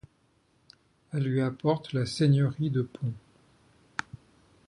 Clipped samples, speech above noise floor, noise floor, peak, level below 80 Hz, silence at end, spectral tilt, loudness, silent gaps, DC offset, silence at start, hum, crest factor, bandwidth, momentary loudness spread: under 0.1%; 41 dB; -68 dBFS; -12 dBFS; -64 dBFS; 1.5 s; -7 dB/octave; -29 LUFS; none; under 0.1%; 1.15 s; none; 20 dB; 11 kHz; 14 LU